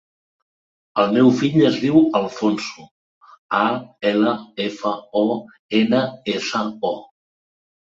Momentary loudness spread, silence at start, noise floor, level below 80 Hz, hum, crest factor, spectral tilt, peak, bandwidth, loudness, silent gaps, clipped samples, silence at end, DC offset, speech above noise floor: 11 LU; 0.95 s; under -90 dBFS; -62 dBFS; none; 18 dB; -6 dB/octave; -2 dBFS; 7.8 kHz; -20 LUFS; 2.91-3.21 s, 3.38-3.49 s, 5.59-5.69 s; under 0.1%; 0.8 s; under 0.1%; over 71 dB